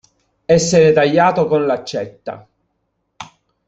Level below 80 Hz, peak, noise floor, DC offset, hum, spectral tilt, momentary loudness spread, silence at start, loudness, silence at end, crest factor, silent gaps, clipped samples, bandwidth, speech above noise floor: -50 dBFS; -2 dBFS; -70 dBFS; under 0.1%; none; -5 dB/octave; 20 LU; 0.5 s; -14 LUFS; 0.45 s; 16 dB; none; under 0.1%; 8.2 kHz; 55 dB